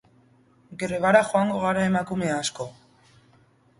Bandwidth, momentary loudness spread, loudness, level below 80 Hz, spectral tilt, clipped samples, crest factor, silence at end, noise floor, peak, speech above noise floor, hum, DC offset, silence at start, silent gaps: 11.5 kHz; 17 LU; -23 LUFS; -58 dBFS; -5 dB/octave; under 0.1%; 22 dB; 1.05 s; -59 dBFS; -4 dBFS; 36 dB; none; under 0.1%; 0.7 s; none